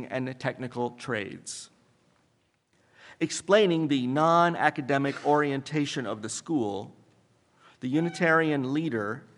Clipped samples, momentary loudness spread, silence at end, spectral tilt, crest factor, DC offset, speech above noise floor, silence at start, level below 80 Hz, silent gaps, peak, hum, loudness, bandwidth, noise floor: under 0.1%; 12 LU; 0.2 s; -5 dB/octave; 22 dB; under 0.1%; 43 dB; 0 s; -76 dBFS; none; -6 dBFS; none; -27 LUFS; 11.5 kHz; -70 dBFS